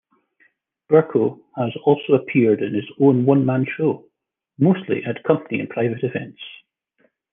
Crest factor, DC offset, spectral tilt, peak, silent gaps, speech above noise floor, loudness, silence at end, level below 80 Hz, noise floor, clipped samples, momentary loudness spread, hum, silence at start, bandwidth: 18 dB; under 0.1%; -11 dB/octave; -2 dBFS; none; 53 dB; -20 LUFS; 0.8 s; -68 dBFS; -71 dBFS; under 0.1%; 10 LU; none; 0.9 s; 3.7 kHz